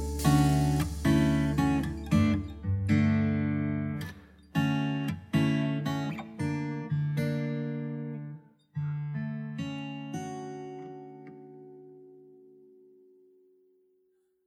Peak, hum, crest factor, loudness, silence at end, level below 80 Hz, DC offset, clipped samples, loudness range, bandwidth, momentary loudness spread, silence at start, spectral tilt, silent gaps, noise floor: -12 dBFS; 50 Hz at -60 dBFS; 18 dB; -30 LUFS; 2.25 s; -46 dBFS; under 0.1%; under 0.1%; 16 LU; 16 kHz; 19 LU; 0 s; -7 dB/octave; none; -71 dBFS